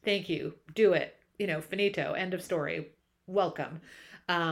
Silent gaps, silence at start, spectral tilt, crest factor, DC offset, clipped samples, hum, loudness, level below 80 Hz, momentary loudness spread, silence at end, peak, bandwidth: none; 0.05 s; -5.5 dB/octave; 18 dB; under 0.1%; under 0.1%; none; -31 LUFS; -70 dBFS; 15 LU; 0 s; -14 dBFS; 15 kHz